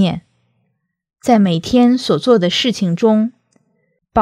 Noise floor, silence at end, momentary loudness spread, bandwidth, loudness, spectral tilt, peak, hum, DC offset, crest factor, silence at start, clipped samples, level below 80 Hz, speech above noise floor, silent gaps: -69 dBFS; 0 s; 8 LU; 13.5 kHz; -14 LUFS; -6 dB/octave; 0 dBFS; none; under 0.1%; 16 dB; 0 s; under 0.1%; -50 dBFS; 56 dB; none